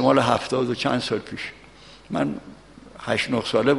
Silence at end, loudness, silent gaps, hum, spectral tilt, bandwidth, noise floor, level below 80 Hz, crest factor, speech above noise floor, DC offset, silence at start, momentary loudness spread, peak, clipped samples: 0 s; -24 LUFS; none; none; -5.5 dB/octave; 11.5 kHz; -47 dBFS; -54 dBFS; 20 dB; 25 dB; under 0.1%; 0 s; 14 LU; -4 dBFS; under 0.1%